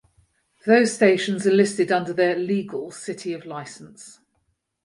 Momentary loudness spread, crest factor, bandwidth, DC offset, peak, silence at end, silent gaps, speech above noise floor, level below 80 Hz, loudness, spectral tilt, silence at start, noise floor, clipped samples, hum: 17 LU; 20 dB; 11.5 kHz; under 0.1%; -2 dBFS; 0.75 s; none; 50 dB; -70 dBFS; -21 LUFS; -5 dB/octave; 0.65 s; -72 dBFS; under 0.1%; none